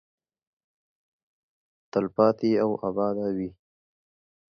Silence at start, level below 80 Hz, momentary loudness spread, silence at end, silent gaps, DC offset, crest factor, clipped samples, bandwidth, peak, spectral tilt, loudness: 1.95 s; -66 dBFS; 9 LU; 1.1 s; none; under 0.1%; 22 dB; under 0.1%; 6.4 kHz; -6 dBFS; -8.5 dB/octave; -26 LUFS